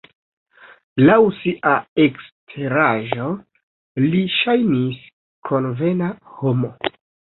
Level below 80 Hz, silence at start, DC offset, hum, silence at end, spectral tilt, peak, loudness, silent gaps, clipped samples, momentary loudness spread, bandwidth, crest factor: -58 dBFS; 0.95 s; under 0.1%; none; 0.5 s; -11.5 dB/octave; -2 dBFS; -19 LUFS; 1.88-1.96 s, 2.32-2.47 s, 3.63-3.95 s, 5.13-5.42 s; under 0.1%; 14 LU; 4.2 kHz; 18 dB